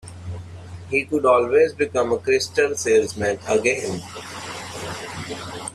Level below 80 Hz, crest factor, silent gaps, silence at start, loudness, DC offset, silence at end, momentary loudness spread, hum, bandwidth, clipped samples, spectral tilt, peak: -56 dBFS; 18 dB; none; 0.05 s; -21 LUFS; under 0.1%; 0 s; 17 LU; none; 13.5 kHz; under 0.1%; -4 dB/octave; -4 dBFS